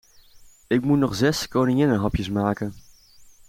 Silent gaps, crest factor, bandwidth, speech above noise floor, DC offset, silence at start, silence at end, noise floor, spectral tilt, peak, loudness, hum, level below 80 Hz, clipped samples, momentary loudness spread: none; 16 dB; 16.5 kHz; 29 dB; under 0.1%; 0.35 s; 0.25 s; -50 dBFS; -6 dB/octave; -8 dBFS; -22 LUFS; none; -44 dBFS; under 0.1%; 6 LU